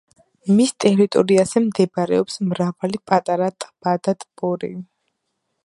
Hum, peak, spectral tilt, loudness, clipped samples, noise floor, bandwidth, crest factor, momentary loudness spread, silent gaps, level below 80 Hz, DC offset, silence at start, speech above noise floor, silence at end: none; 0 dBFS; -6 dB/octave; -19 LUFS; under 0.1%; -74 dBFS; 11.5 kHz; 20 dB; 11 LU; none; -62 dBFS; under 0.1%; 0.45 s; 56 dB; 0.8 s